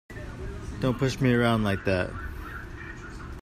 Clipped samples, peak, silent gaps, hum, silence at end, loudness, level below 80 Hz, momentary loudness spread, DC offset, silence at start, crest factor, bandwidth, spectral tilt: under 0.1%; -10 dBFS; none; none; 0 s; -27 LUFS; -42 dBFS; 17 LU; under 0.1%; 0.1 s; 18 dB; 15 kHz; -6.5 dB/octave